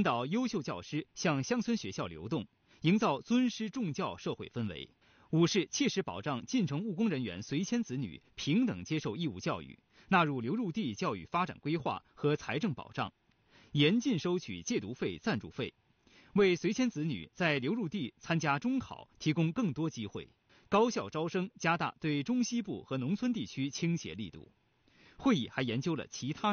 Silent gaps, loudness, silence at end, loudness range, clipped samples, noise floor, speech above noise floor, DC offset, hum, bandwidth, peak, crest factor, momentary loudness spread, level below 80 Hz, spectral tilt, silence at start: none; -34 LUFS; 0 s; 2 LU; under 0.1%; -66 dBFS; 32 dB; under 0.1%; none; 6.8 kHz; -14 dBFS; 20 dB; 10 LU; -68 dBFS; -5 dB/octave; 0 s